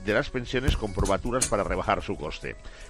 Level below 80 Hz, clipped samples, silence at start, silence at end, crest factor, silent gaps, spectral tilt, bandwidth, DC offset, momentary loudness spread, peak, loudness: -34 dBFS; under 0.1%; 0 s; 0 s; 20 dB; none; -4 dB/octave; 14 kHz; under 0.1%; 9 LU; -8 dBFS; -28 LUFS